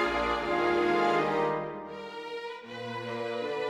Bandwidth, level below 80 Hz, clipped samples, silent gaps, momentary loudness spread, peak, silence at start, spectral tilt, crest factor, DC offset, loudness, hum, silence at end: 11.5 kHz; -54 dBFS; under 0.1%; none; 14 LU; -14 dBFS; 0 s; -5.5 dB/octave; 16 dB; under 0.1%; -30 LUFS; none; 0 s